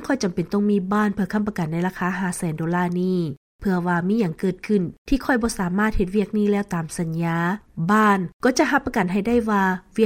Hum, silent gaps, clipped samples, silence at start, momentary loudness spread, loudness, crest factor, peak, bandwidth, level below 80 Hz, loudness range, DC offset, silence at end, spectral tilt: none; 3.37-3.59 s, 4.98-5.05 s, 8.33-8.40 s; under 0.1%; 0 s; 6 LU; -22 LUFS; 16 dB; -6 dBFS; 16 kHz; -40 dBFS; 3 LU; under 0.1%; 0 s; -6.5 dB/octave